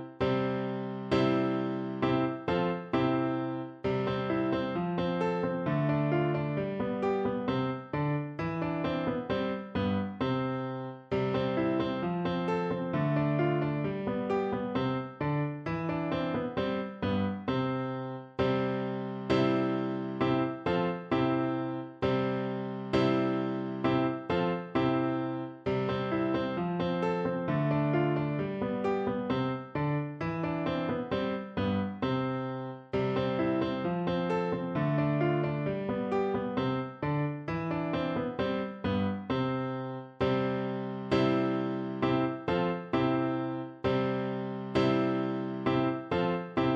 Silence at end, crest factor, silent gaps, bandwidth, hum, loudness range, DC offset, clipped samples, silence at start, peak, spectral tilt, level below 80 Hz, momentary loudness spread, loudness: 0 s; 16 dB; none; 7.6 kHz; none; 2 LU; under 0.1%; under 0.1%; 0 s; -14 dBFS; -8.5 dB/octave; -58 dBFS; 5 LU; -31 LUFS